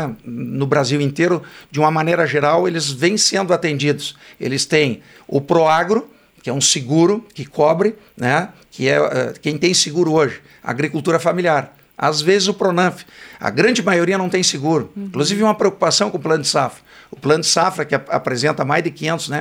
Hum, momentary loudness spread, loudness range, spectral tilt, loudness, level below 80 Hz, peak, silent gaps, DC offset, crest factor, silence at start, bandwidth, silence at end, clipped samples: none; 9 LU; 1 LU; -4 dB/octave; -17 LUFS; -60 dBFS; -2 dBFS; none; under 0.1%; 16 dB; 0 s; 16 kHz; 0 s; under 0.1%